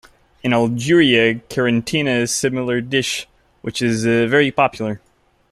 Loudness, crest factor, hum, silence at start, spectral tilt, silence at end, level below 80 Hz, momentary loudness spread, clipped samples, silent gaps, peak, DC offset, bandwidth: -17 LUFS; 16 dB; none; 0.45 s; -4.5 dB/octave; 0.55 s; -52 dBFS; 12 LU; under 0.1%; none; -2 dBFS; under 0.1%; 14 kHz